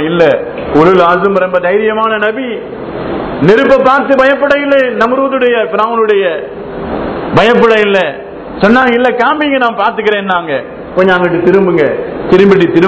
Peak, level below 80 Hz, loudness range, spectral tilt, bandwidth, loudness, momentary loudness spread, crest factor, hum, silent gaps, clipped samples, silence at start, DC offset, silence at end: 0 dBFS; -40 dBFS; 2 LU; -7 dB/octave; 8 kHz; -9 LUFS; 11 LU; 10 dB; none; none; 2%; 0 s; under 0.1%; 0 s